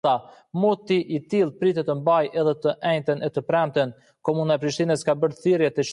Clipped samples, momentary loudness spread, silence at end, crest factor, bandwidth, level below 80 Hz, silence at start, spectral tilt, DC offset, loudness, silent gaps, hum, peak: under 0.1%; 5 LU; 0 s; 14 dB; 11.5 kHz; -68 dBFS; 0.05 s; -6 dB/octave; under 0.1%; -23 LUFS; none; none; -8 dBFS